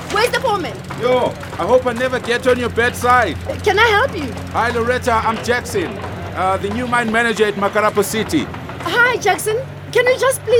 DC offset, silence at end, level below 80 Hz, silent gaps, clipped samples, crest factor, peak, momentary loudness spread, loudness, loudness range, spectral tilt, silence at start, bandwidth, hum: under 0.1%; 0 s; -42 dBFS; none; under 0.1%; 16 dB; -2 dBFS; 8 LU; -17 LUFS; 2 LU; -4 dB/octave; 0 s; over 20 kHz; none